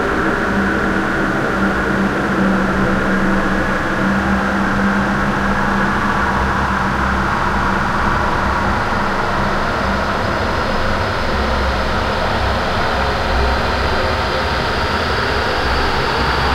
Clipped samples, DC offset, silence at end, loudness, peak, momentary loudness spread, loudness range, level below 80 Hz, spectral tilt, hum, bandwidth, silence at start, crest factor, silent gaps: under 0.1%; under 0.1%; 0 s; -17 LUFS; -2 dBFS; 2 LU; 1 LU; -24 dBFS; -5.5 dB/octave; none; 15.5 kHz; 0 s; 14 dB; none